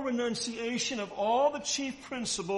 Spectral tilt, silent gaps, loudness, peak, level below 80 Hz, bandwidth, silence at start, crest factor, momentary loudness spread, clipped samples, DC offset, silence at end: -2.5 dB/octave; none; -31 LUFS; -16 dBFS; -66 dBFS; 11.5 kHz; 0 s; 16 dB; 6 LU; under 0.1%; under 0.1%; 0 s